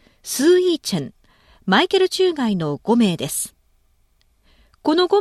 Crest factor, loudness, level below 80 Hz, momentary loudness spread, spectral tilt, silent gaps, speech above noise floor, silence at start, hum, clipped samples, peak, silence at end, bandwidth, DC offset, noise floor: 16 dB; -19 LUFS; -58 dBFS; 11 LU; -4.5 dB/octave; none; 43 dB; 0.25 s; none; under 0.1%; -4 dBFS; 0 s; 14 kHz; under 0.1%; -60 dBFS